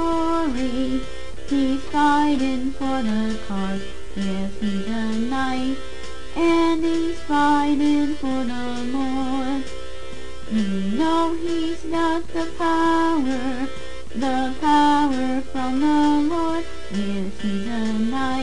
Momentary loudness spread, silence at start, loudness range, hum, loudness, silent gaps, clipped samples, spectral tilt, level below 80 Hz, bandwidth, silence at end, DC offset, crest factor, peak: 11 LU; 0 s; 4 LU; none; -22 LUFS; none; under 0.1%; -5.5 dB/octave; -40 dBFS; 10 kHz; 0 s; 5%; 14 dB; -8 dBFS